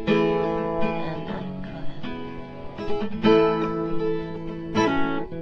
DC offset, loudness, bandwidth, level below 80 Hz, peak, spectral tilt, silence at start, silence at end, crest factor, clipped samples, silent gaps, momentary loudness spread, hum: under 0.1%; -25 LUFS; 6.8 kHz; -44 dBFS; -6 dBFS; -7 dB/octave; 0 s; 0 s; 18 dB; under 0.1%; none; 16 LU; none